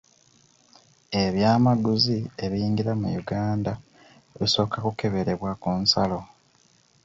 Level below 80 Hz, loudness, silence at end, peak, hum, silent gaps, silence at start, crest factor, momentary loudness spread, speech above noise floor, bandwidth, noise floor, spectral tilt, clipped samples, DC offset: -52 dBFS; -24 LUFS; 0.8 s; -4 dBFS; none; none; 1.1 s; 22 dB; 8 LU; 37 dB; 7.8 kHz; -61 dBFS; -6 dB/octave; under 0.1%; under 0.1%